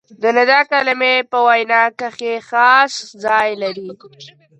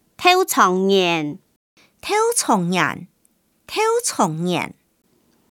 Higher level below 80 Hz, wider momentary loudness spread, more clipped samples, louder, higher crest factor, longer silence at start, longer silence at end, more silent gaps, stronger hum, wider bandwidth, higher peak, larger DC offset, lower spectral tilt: about the same, -68 dBFS vs -66 dBFS; second, 12 LU vs 15 LU; neither; first, -14 LUFS vs -18 LUFS; about the same, 16 dB vs 20 dB; about the same, 0.2 s vs 0.2 s; second, 0.3 s vs 0.8 s; second, none vs 1.56-1.77 s; neither; second, 9.6 kHz vs 18.5 kHz; about the same, 0 dBFS vs -2 dBFS; neither; about the same, -2.5 dB/octave vs -3.5 dB/octave